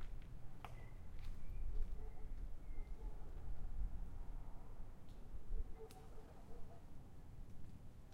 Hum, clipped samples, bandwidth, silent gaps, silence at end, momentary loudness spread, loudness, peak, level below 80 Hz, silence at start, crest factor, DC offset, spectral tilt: none; under 0.1%; 4.9 kHz; none; 0 s; 9 LU; -56 LUFS; -30 dBFS; -48 dBFS; 0 s; 16 dB; under 0.1%; -7 dB/octave